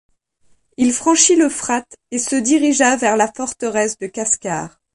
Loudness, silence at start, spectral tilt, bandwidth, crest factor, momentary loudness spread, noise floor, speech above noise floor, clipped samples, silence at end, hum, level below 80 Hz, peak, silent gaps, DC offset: -16 LUFS; 0.8 s; -2.5 dB/octave; 11.5 kHz; 18 dB; 11 LU; -58 dBFS; 41 dB; under 0.1%; 0.25 s; none; -58 dBFS; 0 dBFS; none; under 0.1%